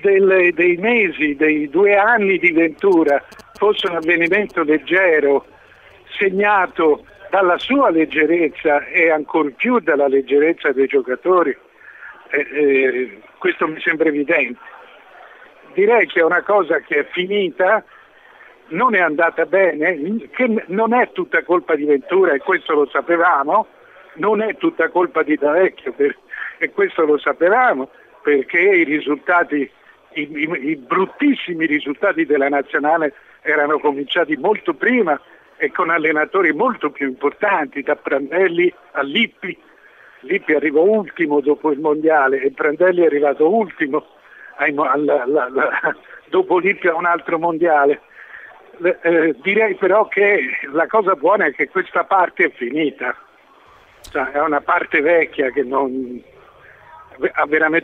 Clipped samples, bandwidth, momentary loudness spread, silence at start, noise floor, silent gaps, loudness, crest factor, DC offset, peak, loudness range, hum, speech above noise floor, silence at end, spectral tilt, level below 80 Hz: under 0.1%; 6.2 kHz; 8 LU; 0.05 s; -49 dBFS; none; -17 LUFS; 16 dB; under 0.1%; -2 dBFS; 3 LU; none; 32 dB; 0 s; -7 dB/octave; -62 dBFS